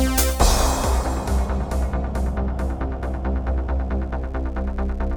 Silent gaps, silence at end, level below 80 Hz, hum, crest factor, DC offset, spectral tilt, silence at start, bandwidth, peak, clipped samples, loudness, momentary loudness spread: none; 0 s; -22 dBFS; none; 18 dB; under 0.1%; -5 dB/octave; 0 s; over 20 kHz; -4 dBFS; under 0.1%; -24 LUFS; 9 LU